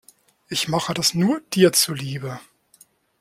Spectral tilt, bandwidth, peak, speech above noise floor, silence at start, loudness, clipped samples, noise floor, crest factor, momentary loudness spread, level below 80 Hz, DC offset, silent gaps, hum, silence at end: -4 dB/octave; 16.5 kHz; -2 dBFS; 35 dB; 0.5 s; -20 LUFS; under 0.1%; -56 dBFS; 20 dB; 15 LU; -60 dBFS; under 0.1%; none; none; 0.8 s